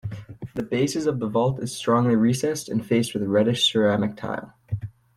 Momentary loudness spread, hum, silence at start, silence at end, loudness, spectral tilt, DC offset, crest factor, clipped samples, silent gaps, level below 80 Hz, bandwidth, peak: 14 LU; none; 0.05 s; 0.25 s; -23 LUFS; -5.5 dB/octave; under 0.1%; 16 dB; under 0.1%; none; -56 dBFS; 15 kHz; -8 dBFS